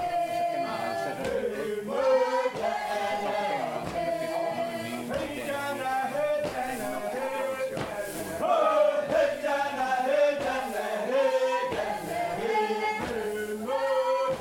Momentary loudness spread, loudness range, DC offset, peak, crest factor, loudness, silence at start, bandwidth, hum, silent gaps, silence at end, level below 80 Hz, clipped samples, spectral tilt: 8 LU; 4 LU; under 0.1%; -12 dBFS; 16 dB; -28 LUFS; 0 s; 17.5 kHz; none; none; 0 s; -60 dBFS; under 0.1%; -4 dB/octave